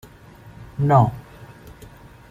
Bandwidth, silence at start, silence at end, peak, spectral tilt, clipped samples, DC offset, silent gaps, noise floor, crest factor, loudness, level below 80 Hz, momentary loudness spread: 15 kHz; 0.6 s; 0.85 s; -4 dBFS; -9 dB/octave; under 0.1%; under 0.1%; none; -45 dBFS; 20 dB; -19 LUFS; -48 dBFS; 27 LU